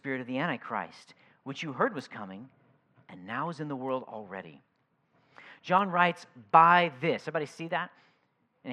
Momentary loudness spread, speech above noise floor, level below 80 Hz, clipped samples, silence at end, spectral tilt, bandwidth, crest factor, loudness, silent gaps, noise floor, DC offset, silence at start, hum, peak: 22 LU; 43 dB; -88 dBFS; under 0.1%; 0 s; -6 dB/octave; 11 kHz; 26 dB; -28 LUFS; none; -73 dBFS; under 0.1%; 0.05 s; none; -6 dBFS